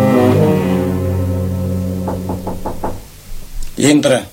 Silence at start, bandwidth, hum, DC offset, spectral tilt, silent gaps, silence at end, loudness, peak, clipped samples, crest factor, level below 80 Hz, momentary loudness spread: 0 s; 16.5 kHz; none; under 0.1%; -6 dB/octave; none; 0 s; -16 LUFS; 0 dBFS; under 0.1%; 14 dB; -30 dBFS; 21 LU